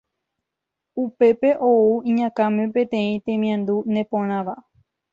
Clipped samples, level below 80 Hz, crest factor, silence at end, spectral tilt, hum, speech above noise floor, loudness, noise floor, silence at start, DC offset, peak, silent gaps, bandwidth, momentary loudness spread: under 0.1%; -66 dBFS; 14 dB; 0.5 s; -8.5 dB/octave; none; 63 dB; -20 LUFS; -83 dBFS; 0.95 s; under 0.1%; -6 dBFS; none; 7 kHz; 11 LU